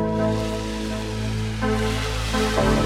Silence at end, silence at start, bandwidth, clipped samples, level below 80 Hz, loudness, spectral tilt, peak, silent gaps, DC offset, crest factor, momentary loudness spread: 0 s; 0 s; 15.5 kHz; under 0.1%; -30 dBFS; -24 LUFS; -5.5 dB/octave; -8 dBFS; none; under 0.1%; 14 dB; 6 LU